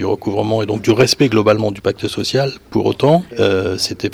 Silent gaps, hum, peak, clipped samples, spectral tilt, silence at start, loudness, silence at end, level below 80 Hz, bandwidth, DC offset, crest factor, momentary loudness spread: none; none; -2 dBFS; under 0.1%; -5.5 dB/octave; 0 s; -16 LUFS; 0 s; -48 dBFS; 17.5 kHz; under 0.1%; 14 dB; 7 LU